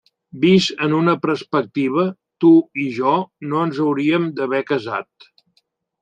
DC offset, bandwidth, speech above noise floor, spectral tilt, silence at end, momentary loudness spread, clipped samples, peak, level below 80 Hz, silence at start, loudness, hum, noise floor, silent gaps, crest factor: under 0.1%; 8.8 kHz; 48 dB; -6.5 dB/octave; 1 s; 9 LU; under 0.1%; -2 dBFS; -64 dBFS; 0.35 s; -18 LUFS; none; -66 dBFS; none; 16 dB